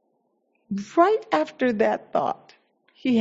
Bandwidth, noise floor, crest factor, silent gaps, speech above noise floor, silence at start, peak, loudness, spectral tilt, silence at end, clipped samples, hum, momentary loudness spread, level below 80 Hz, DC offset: 7.8 kHz; -70 dBFS; 20 dB; none; 48 dB; 0.7 s; -4 dBFS; -24 LUFS; -6 dB/octave; 0 s; under 0.1%; none; 13 LU; -68 dBFS; under 0.1%